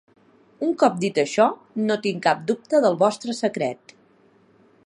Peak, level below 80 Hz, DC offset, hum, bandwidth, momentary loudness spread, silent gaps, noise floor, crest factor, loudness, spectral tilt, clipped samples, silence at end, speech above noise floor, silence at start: -4 dBFS; -74 dBFS; under 0.1%; none; 11 kHz; 8 LU; none; -57 dBFS; 20 dB; -22 LUFS; -5 dB/octave; under 0.1%; 1.1 s; 36 dB; 0.6 s